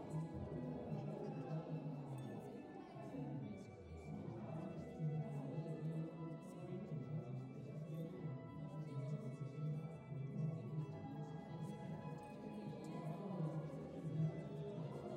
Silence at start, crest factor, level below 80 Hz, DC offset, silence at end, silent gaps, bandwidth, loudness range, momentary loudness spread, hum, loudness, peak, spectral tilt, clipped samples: 0 s; 16 dB; -74 dBFS; under 0.1%; 0 s; none; 9.8 kHz; 2 LU; 7 LU; none; -48 LUFS; -32 dBFS; -9 dB/octave; under 0.1%